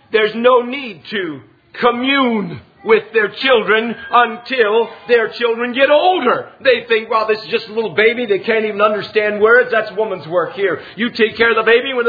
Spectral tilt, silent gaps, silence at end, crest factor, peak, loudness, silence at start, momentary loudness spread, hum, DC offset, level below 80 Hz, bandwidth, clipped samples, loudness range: -6.5 dB/octave; none; 0 s; 16 dB; 0 dBFS; -15 LUFS; 0.1 s; 9 LU; none; under 0.1%; -58 dBFS; 5 kHz; under 0.1%; 2 LU